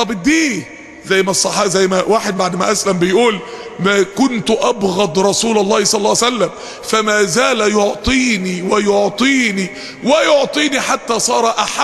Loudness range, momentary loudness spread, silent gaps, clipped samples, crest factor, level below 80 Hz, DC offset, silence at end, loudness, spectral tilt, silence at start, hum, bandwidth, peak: 1 LU; 6 LU; none; under 0.1%; 14 dB; -42 dBFS; under 0.1%; 0 s; -14 LUFS; -3 dB/octave; 0 s; none; 13 kHz; 0 dBFS